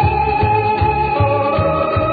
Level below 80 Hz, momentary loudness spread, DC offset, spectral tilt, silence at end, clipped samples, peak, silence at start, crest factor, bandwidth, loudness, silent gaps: -30 dBFS; 1 LU; under 0.1%; -10 dB/octave; 0 s; under 0.1%; -4 dBFS; 0 s; 12 dB; 4.9 kHz; -15 LUFS; none